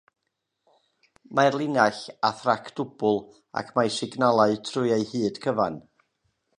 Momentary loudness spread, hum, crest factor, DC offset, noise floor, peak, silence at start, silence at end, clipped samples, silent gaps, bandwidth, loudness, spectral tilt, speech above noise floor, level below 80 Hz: 7 LU; none; 22 dB; under 0.1%; -80 dBFS; -4 dBFS; 1.3 s; 0.8 s; under 0.1%; none; 10.5 kHz; -25 LUFS; -5 dB/octave; 56 dB; -68 dBFS